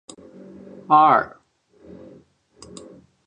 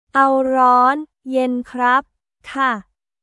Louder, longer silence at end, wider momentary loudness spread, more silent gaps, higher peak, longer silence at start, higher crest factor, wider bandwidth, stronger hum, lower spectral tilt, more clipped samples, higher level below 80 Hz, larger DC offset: about the same, -16 LUFS vs -17 LUFS; first, 2 s vs 0.4 s; first, 28 LU vs 11 LU; neither; about the same, -4 dBFS vs -2 dBFS; first, 0.9 s vs 0.15 s; about the same, 20 dB vs 16 dB; second, 10 kHz vs 11.5 kHz; neither; about the same, -5.5 dB/octave vs -4.5 dB/octave; neither; about the same, -64 dBFS vs -60 dBFS; neither